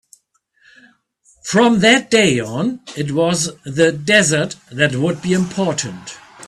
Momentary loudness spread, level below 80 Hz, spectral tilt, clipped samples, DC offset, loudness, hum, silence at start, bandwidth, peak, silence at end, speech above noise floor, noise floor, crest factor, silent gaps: 13 LU; -54 dBFS; -4 dB/octave; under 0.1%; under 0.1%; -16 LUFS; none; 1.45 s; 13 kHz; 0 dBFS; 0 s; 44 dB; -60 dBFS; 18 dB; none